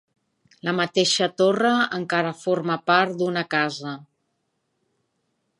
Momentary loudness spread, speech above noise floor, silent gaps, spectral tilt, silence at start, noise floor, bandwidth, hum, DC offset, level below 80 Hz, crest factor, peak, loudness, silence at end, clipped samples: 9 LU; 52 dB; none; -4 dB/octave; 0.65 s; -74 dBFS; 11.5 kHz; none; under 0.1%; -74 dBFS; 20 dB; -4 dBFS; -22 LUFS; 1.55 s; under 0.1%